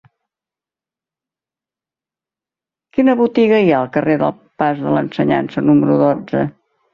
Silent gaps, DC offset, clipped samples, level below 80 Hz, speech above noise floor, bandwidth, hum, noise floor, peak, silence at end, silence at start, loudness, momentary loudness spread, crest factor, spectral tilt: none; under 0.1%; under 0.1%; -56 dBFS; 75 dB; 5.8 kHz; none; -89 dBFS; -2 dBFS; 0.45 s; 2.95 s; -15 LUFS; 8 LU; 16 dB; -9 dB/octave